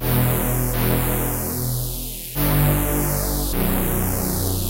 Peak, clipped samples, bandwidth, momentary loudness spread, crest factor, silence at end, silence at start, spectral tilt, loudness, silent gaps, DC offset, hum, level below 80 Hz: -6 dBFS; under 0.1%; 17 kHz; 5 LU; 14 dB; 0 s; 0 s; -5 dB/octave; -21 LUFS; none; 0.1%; none; -28 dBFS